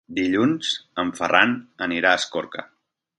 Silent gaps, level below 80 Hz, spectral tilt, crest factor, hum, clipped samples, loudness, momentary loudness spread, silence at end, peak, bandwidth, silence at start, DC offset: none; -60 dBFS; -3.5 dB/octave; 22 dB; none; under 0.1%; -21 LUFS; 11 LU; 0.55 s; 0 dBFS; 11.5 kHz; 0.1 s; under 0.1%